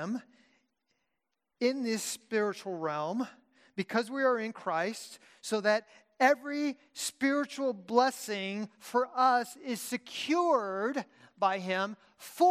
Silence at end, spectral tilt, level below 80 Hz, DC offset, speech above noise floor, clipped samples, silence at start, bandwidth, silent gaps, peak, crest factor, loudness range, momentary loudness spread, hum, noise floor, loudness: 0 s; -3.5 dB/octave; -88 dBFS; under 0.1%; 54 dB; under 0.1%; 0 s; 15.5 kHz; none; -12 dBFS; 20 dB; 4 LU; 12 LU; none; -85 dBFS; -31 LUFS